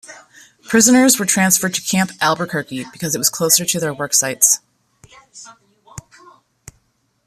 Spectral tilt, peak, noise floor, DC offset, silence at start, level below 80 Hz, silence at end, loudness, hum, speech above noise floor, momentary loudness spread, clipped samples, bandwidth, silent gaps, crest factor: -2.5 dB/octave; 0 dBFS; -64 dBFS; under 0.1%; 0.1 s; -58 dBFS; 1.25 s; -15 LUFS; none; 48 dB; 11 LU; under 0.1%; 15 kHz; none; 18 dB